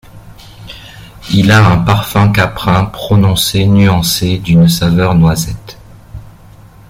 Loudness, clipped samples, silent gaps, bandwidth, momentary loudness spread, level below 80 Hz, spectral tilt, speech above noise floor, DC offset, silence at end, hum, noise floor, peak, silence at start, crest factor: -10 LUFS; under 0.1%; none; 16.5 kHz; 19 LU; -32 dBFS; -5.5 dB/octave; 28 dB; under 0.1%; 0.65 s; none; -37 dBFS; 0 dBFS; 0.15 s; 12 dB